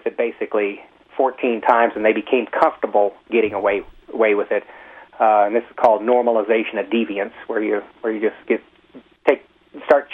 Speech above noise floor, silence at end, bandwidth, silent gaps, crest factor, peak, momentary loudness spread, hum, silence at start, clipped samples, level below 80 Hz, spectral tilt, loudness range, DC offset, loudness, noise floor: 28 dB; 0 s; 6 kHz; none; 18 dB; -2 dBFS; 9 LU; none; 0.05 s; under 0.1%; -60 dBFS; -6.5 dB/octave; 4 LU; under 0.1%; -19 LUFS; -47 dBFS